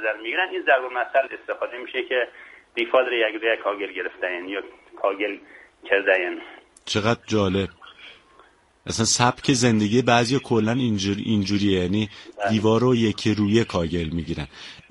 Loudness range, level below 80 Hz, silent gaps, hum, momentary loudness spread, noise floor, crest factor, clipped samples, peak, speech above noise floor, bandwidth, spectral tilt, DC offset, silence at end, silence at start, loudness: 4 LU; -50 dBFS; none; none; 13 LU; -55 dBFS; 20 dB; under 0.1%; -2 dBFS; 33 dB; 11.5 kHz; -4.5 dB/octave; under 0.1%; 0.1 s; 0 s; -23 LUFS